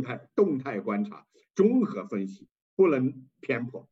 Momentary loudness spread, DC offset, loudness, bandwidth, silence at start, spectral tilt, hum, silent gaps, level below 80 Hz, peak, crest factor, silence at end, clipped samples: 13 LU; under 0.1%; -28 LUFS; 7.6 kHz; 0 s; -8.5 dB/octave; none; 2.51-2.55 s, 2.62-2.77 s; -80 dBFS; -10 dBFS; 18 dB; 0.1 s; under 0.1%